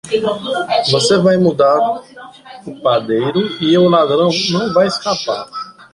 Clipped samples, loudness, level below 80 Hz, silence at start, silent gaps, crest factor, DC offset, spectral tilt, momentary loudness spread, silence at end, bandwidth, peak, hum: under 0.1%; -14 LUFS; -54 dBFS; 0.05 s; none; 14 dB; under 0.1%; -5 dB/octave; 11 LU; 0.1 s; 11.5 kHz; -2 dBFS; none